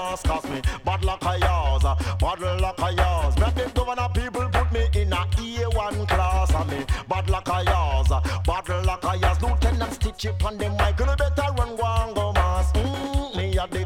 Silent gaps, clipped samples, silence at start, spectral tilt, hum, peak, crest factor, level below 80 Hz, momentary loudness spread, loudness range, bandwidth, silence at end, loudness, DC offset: none; under 0.1%; 0 s; -5.5 dB/octave; none; -8 dBFS; 14 dB; -26 dBFS; 4 LU; 1 LU; 14 kHz; 0 s; -24 LUFS; under 0.1%